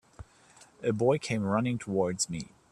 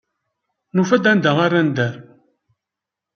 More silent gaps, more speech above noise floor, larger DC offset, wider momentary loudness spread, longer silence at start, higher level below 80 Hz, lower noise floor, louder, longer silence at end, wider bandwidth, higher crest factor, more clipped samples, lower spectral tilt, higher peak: neither; second, 29 dB vs 69 dB; neither; second, 6 LU vs 9 LU; second, 0.2 s vs 0.75 s; about the same, -60 dBFS vs -64 dBFS; second, -58 dBFS vs -85 dBFS; second, -30 LUFS vs -17 LUFS; second, 0.3 s vs 1.15 s; first, 13 kHz vs 6.8 kHz; about the same, 18 dB vs 18 dB; neither; second, -5 dB/octave vs -6.5 dB/octave; second, -12 dBFS vs -2 dBFS